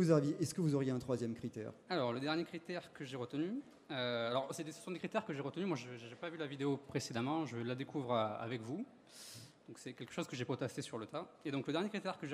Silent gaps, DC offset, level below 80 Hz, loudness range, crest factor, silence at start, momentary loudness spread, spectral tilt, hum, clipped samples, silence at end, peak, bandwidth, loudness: none; under 0.1%; -78 dBFS; 3 LU; 22 dB; 0 s; 11 LU; -6 dB/octave; none; under 0.1%; 0 s; -18 dBFS; 15.5 kHz; -41 LUFS